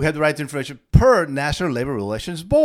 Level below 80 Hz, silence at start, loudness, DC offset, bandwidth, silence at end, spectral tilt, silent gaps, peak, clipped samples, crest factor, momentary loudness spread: -30 dBFS; 0 s; -20 LUFS; under 0.1%; 15 kHz; 0 s; -6.5 dB/octave; none; 0 dBFS; under 0.1%; 18 dB; 12 LU